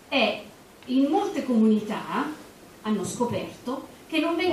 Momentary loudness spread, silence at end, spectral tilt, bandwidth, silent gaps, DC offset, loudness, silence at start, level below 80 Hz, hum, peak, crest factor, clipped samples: 14 LU; 0 s; -5 dB/octave; 15 kHz; none; under 0.1%; -26 LUFS; 0.1 s; -64 dBFS; none; -8 dBFS; 18 dB; under 0.1%